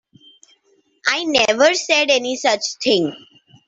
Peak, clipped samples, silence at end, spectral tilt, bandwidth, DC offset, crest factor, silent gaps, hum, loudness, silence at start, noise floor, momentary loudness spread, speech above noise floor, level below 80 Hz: 0 dBFS; under 0.1%; 0.5 s; -2 dB/octave; 8.2 kHz; under 0.1%; 18 dB; none; none; -17 LUFS; 1.05 s; -60 dBFS; 6 LU; 43 dB; -62 dBFS